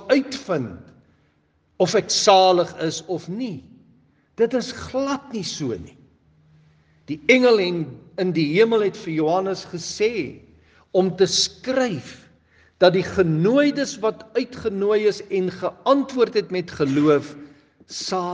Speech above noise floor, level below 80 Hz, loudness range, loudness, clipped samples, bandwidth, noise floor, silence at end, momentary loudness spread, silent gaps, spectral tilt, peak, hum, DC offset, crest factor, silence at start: 43 dB; -62 dBFS; 6 LU; -21 LUFS; under 0.1%; 10 kHz; -64 dBFS; 0 s; 12 LU; none; -4.5 dB/octave; 0 dBFS; none; under 0.1%; 22 dB; 0 s